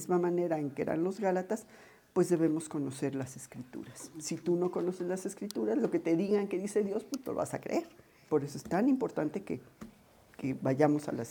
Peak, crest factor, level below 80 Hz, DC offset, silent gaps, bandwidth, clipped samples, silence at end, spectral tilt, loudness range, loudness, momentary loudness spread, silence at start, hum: -12 dBFS; 20 dB; -72 dBFS; under 0.1%; none; 18.5 kHz; under 0.1%; 0 s; -6.5 dB/octave; 2 LU; -33 LUFS; 13 LU; 0 s; none